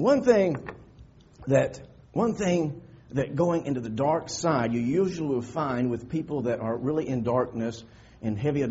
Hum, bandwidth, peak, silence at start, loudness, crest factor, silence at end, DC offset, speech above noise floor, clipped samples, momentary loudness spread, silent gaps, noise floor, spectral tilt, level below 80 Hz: none; 8 kHz; -6 dBFS; 0 s; -27 LUFS; 20 dB; 0 s; under 0.1%; 26 dB; under 0.1%; 10 LU; none; -52 dBFS; -7 dB/octave; -56 dBFS